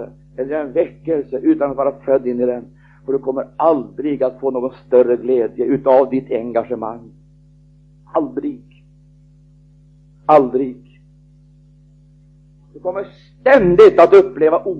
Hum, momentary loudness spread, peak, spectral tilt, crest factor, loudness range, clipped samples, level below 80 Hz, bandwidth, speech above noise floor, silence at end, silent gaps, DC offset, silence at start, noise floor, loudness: 50 Hz at -45 dBFS; 17 LU; 0 dBFS; -8 dB/octave; 16 dB; 10 LU; under 0.1%; -50 dBFS; 7 kHz; 33 dB; 0 s; none; under 0.1%; 0 s; -48 dBFS; -16 LUFS